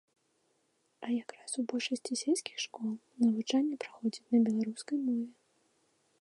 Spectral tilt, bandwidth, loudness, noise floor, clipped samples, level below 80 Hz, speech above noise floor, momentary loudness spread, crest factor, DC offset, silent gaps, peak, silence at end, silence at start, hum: -4 dB/octave; 11.5 kHz; -33 LUFS; -76 dBFS; under 0.1%; -88 dBFS; 43 dB; 10 LU; 16 dB; under 0.1%; none; -18 dBFS; 0.9 s; 1 s; none